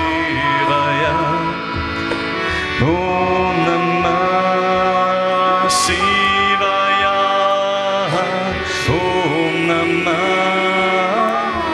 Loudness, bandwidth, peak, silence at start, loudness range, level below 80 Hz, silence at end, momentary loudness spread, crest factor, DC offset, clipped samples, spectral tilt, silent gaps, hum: -16 LUFS; 13.5 kHz; -2 dBFS; 0 s; 3 LU; -40 dBFS; 0 s; 5 LU; 14 dB; under 0.1%; under 0.1%; -4.5 dB/octave; none; none